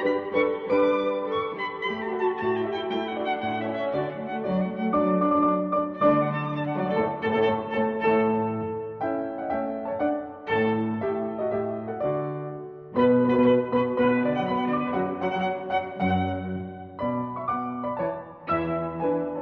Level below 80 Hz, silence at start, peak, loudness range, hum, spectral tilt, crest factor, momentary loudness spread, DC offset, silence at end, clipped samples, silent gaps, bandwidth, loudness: -60 dBFS; 0 s; -10 dBFS; 4 LU; none; -9 dB/octave; 16 dB; 9 LU; under 0.1%; 0 s; under 0.1%; none; 6.2 kHz; -26 LUFS